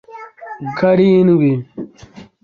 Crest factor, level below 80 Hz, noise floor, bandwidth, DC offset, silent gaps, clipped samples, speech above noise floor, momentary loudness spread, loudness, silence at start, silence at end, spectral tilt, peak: 14 dB; -54 dBFS; -40 dBFS; 6.6 kHz; under 0.1%; none; under 0.1%; 28 dB; 23 LU; -13 LUFS; 0.1 s; 0.2 s; -9.5 dB/octave; -2 dBFS